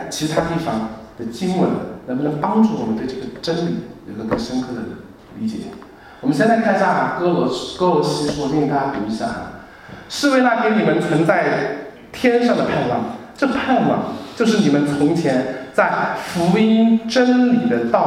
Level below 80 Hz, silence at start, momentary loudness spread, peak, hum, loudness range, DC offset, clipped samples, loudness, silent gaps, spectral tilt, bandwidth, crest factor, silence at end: -50 dBFS; 0 s; 14 LU; 0 dBFS; none; 5 LU; under 0.1%; under 0.1%; -18 LUFS; none; -6 dB/octave; 14.5 kHz; 18 dB; 0 s